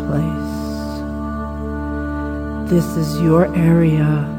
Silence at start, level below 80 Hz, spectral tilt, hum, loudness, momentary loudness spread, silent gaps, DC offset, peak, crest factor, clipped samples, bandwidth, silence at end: 0 s; -30 dBFS; -8 dB/octave; none; -19 LUFS; 11 LU; none; under 0.1%; -2 dBFS; 14 dB; under 0.1%; 16.5 kHz; 0 s